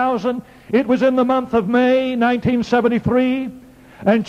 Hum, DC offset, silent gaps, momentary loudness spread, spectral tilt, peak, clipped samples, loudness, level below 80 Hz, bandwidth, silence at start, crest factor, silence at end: none; under 0.1%; none; 8 LU; -7 dB/octave; -2 dBFS; under 0.1%; -17 LUFS; -48 dBFS; 7.2 kHz; 0 s; 14 dB; 0 s